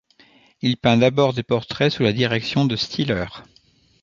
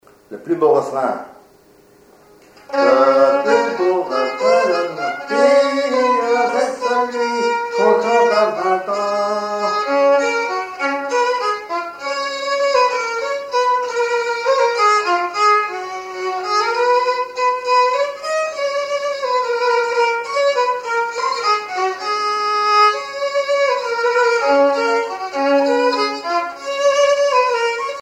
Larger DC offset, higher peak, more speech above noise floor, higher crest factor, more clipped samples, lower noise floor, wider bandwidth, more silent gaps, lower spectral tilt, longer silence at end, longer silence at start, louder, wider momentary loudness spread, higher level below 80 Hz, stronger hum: neither; about the same, -2 dBFS vs -2 dBFS; about the same, 38 dB vs 35 dB; about the same, 20 dB vs 16 dB; neither; first, -57 dBFS vs -49 dBFS; second, 7.4 kHz vs 12 kHz; neither; first, -6.5 dB/octave vs -2.5 dB/octave; first, 0.6 s vs 0 s; first, 0.65 s vs 0.3 s; second, -20 LUFS vs -17 LUFS; about the same, 8 LU vs 7 LU; first, -50 dBFS vs -66 dBFS; neither